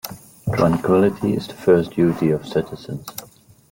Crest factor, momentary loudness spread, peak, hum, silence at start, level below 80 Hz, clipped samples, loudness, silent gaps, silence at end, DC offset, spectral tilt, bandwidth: 16 dB; 15 LU; -4 dBFS; none; 0.05 s; -50 dBFS; under 0.1%; -19 LUFS; none; 0.5 s; under 0.1%; -7 dB/octave; 17 kHz